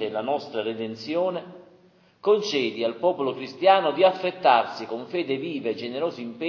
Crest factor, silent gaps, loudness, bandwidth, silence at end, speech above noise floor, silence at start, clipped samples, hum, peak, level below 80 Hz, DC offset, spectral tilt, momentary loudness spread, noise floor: 20 dB; none; -24 LUFS; 7 kHz; 0 s; 33 dB; 0 s; under 0.1%; none; -4 dBFS; -76 dBFS; under 0.1%; -5 dB/octave; 11 LU; -57 dBFS